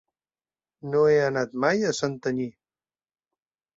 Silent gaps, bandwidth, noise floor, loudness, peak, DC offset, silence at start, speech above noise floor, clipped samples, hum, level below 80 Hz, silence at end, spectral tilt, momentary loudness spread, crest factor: none; 7.8 kHz; under -90 dBFS; -24 LUFS; -8 dBFS; under 0.1%; 0.85 s; over 66 dB; under 0.1%; none; -66 dBFS; 1.3 s; -5 dB/octave; 11 LU; 20 dB